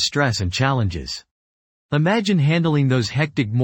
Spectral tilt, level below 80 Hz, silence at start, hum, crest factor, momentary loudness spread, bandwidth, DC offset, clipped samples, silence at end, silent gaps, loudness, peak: -5.5 dB/octave; -44 dBFS; 0 s; none; 16 dB; 8 LU; 16.5 kHz; under 0.1%; under 0.1%; 0 s; 1.31-1.89 s; -20 LUFS; -4 dBFS